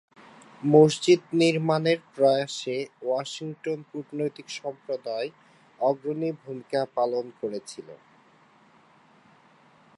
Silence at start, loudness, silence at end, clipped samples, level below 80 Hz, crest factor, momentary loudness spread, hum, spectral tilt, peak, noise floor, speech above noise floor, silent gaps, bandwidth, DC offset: 0.6 s; -26 LUFS; 2 s; under 0.1%; -78 dBFS; 22 dB; 15 LU; none; -5.5 dB/octave; -4 dBFS; -58 dBFS; 33 dB; none; 11.5 kHz; under 0.1%